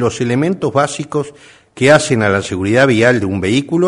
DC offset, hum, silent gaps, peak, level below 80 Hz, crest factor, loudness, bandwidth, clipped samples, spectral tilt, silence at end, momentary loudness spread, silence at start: under 0.1%; none; none; 0 dBFS; -48 dBFS; 14 dB; -14 LUFS; 11 kHz; 0.1%; -5.5 dB/octave; 0 s; 9 LU; 0 s